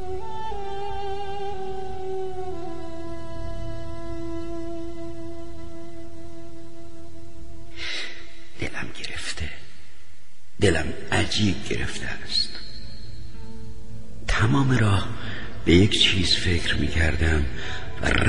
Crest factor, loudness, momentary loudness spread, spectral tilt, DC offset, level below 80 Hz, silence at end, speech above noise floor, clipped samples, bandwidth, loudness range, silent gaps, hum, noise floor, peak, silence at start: 22 dB; -26 LUFS; 22 LU; -5 dB/octave; 6%; -36 dBFS; 0 s; 33 dB; under 0.1%; 11.5 kHz; 16 LU; none; none; -55 dBFS; -4 dBFS; 0 s